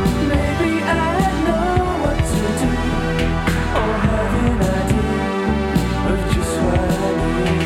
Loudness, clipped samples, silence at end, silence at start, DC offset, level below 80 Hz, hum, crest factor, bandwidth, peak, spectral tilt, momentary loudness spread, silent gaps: -18 LUFS; under 0.1%; 0 s; 0 s; under 0.1%; -26 dBFS; none; 14 dB; 16 kHz; -4 dBFS; -6 dB/octave; 2 LU; none